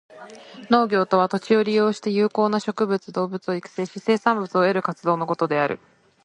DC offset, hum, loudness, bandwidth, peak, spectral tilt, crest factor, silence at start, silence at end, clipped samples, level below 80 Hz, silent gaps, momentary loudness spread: under 0.1%; none; -22 LUFS; 10 kHz; 0 dBFS; -6.5 dB/octave; 22 dB; 0.15 s; 0.5 s; under 0.1%; -70 dBFS; none; 9 LU